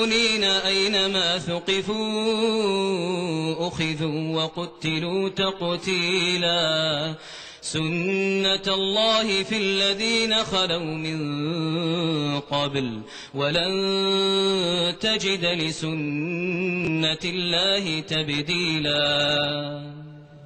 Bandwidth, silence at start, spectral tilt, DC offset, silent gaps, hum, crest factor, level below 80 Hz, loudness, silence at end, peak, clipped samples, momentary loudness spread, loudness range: 12 kHz; 0 s; -4 dB/octave; under 0.1%; none; none; 16 dB; -56 dBFS; -23 LUFS; 0 s; -8 dBFS; under 0.1%; 7 LU; 3 LU